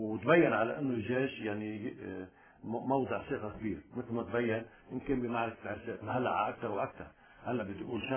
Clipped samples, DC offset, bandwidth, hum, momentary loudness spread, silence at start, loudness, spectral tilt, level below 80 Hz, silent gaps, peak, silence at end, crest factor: under 0.1%; under 0.1%; 3.5 kHz; none; 14 LU; 0 s; -35 LUFS; -5.5 dB/octave; -62 dBFS; none; -14 dBFS; 0 s; 22 dB